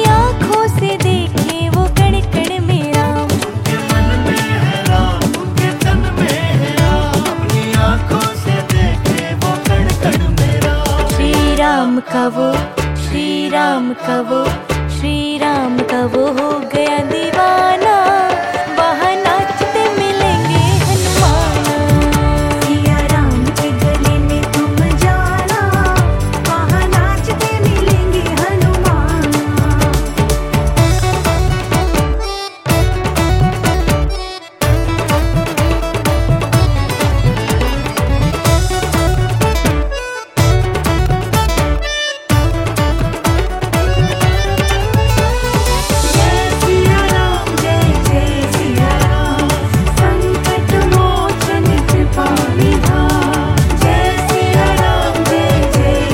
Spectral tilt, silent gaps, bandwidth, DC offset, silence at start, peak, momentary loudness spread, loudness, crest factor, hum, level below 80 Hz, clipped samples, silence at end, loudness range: -5.5 dB/octave; none; 17 kHz; under 0.1%; 0 s; 0 dBFS; 4 LU; -14 LUFS; 12 dB; none; -20 dBFS; under 0.1%; 0 s; 2 LU